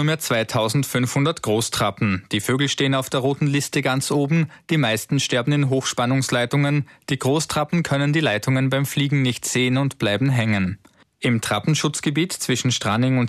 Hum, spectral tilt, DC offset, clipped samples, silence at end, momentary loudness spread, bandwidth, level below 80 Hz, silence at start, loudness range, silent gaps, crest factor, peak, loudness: none; -5 dB/octave; under 0.1%; under 0.1%; 0 s; 3 LU; 14 kHz; -56 dBFS; 0 s; 1 LU; none; 12 dB; -8 dBFS; -21 LUFS